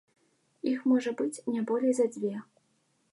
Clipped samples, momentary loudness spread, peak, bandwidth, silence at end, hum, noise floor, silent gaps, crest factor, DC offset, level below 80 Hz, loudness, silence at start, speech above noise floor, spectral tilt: under 0.1%; 9 LU; -16 dBFS; 11.5 kHz; 0.7 s; none; -72 dBFS; none; 16 dB; under 0.1%; -86 dBFS; -30 LUFS; 0.65 s; 44 dB; -5.5 dB/octave